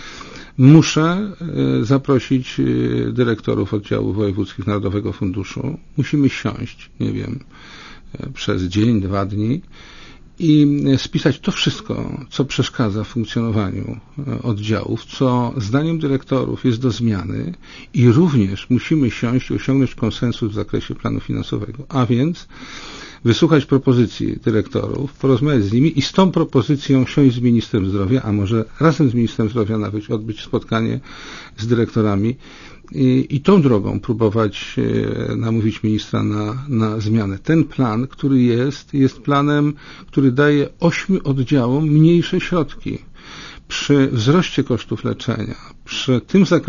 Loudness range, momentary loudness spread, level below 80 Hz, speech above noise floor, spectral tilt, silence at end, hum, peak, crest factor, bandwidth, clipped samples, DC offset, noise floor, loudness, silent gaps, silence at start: 5 LU; 12 LU; -42 dBFS; 19 dB; -7 dB/octave; 0 s; none; 0 dBFS; 18 dB; 7.4 kHz; under 0.1%; under 0.1%; -37 dBFS; -18 LUFS; none; 0 s